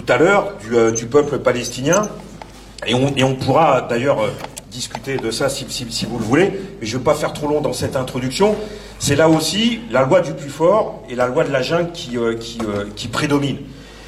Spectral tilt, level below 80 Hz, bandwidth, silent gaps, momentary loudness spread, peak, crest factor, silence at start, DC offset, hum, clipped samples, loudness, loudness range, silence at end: -4.5 dB/octave; -44 dBFS; 15.5 kHz; none; 12 LU; 0 dBFS; 18 dB; 0 s; under 0.1%; none; under 0.1%; -18 LUFS; 3 LU; 0 s